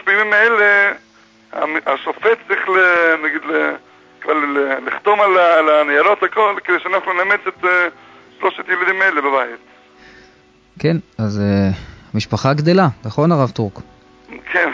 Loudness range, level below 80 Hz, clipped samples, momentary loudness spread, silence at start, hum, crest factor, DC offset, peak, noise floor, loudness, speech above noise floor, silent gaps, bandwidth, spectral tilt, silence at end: 5 LU; -46 dBFS; under 0.1%; 11 LU; 0.05 s; none; 16 dB; under 0.1%; -2 dBFS; -50 dBFS; -15 LUFS; 35 dB; none; 7.8 kHz; -6.5 dB/octave; 0 s